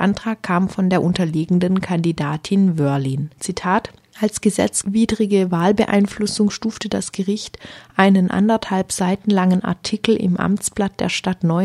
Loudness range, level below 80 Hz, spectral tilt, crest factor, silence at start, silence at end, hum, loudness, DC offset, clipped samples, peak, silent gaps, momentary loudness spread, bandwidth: 2 LU; -50 dBFS; -5.5 dB/octave; 18 dB; 0 s; 0 s; none; -19 LUFS; under 0.1%; under 0.1%; 0 dBFS; none; 7 LU; 13 kHz